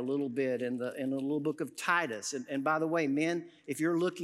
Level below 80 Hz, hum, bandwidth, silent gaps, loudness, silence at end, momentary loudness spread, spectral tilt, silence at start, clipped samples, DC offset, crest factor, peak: under -90 dBFS; none; 15 kHz; none; -33 LUFS; 0 s; 6 LU; -5 dB/octave; 0 s; under 0.1%; under 0.1%; 18 dB; -14 dBFS